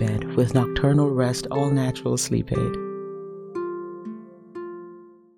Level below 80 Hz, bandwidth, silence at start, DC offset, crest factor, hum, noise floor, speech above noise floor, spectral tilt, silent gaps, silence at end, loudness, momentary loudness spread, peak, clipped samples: -44 dBFS; 16.5 kHz; 0 s; under 0.1%; 18 dB; none; -46 dBFS; 25 dB; -6 dB/octave; none; 0.3 s; -24 LUFS; 18 LU; -6 dBFS; under 0.1%